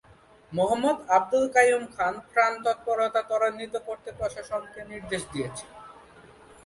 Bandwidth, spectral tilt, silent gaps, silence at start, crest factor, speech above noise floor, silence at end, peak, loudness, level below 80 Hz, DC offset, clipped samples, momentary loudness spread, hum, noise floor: 11.5 kHz; -4 dB/octave; none; 0.5 s; 22 dB; 25 dB; 0.75 s; -6 dBFS; -26 LUFS; -58 dBFS; under 0.1%; under 0.1%; 15 LU; none; -52 dBFS